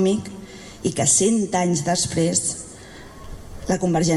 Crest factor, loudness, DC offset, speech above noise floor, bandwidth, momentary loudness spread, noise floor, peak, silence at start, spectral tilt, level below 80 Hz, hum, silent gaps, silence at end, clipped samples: 18 dB; -20 LUFS; under 0.1%; 20 dB; 13 kHz; 23 LU; -40 dBFS; -4 dBFS; 0 s; -4 dB/octave; -44 dBFS; none; none; 0 s; under 0.1%